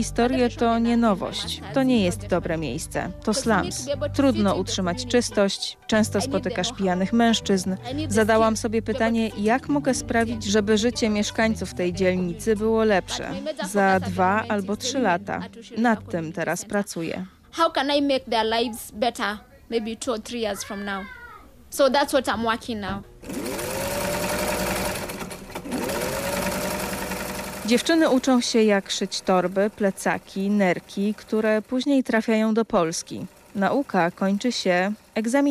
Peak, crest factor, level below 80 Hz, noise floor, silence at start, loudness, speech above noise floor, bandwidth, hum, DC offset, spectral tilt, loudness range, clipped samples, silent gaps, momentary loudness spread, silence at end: -8 dBFS; 14 dB; -46 dBFS; -45 dBFS; 0 s; -23 LUFS; 22 dB; 15.5 kHz; none; under 0.1%; -4.5 dB/octave; 4 LU; under 0.1%; none; 10 LU; 0 s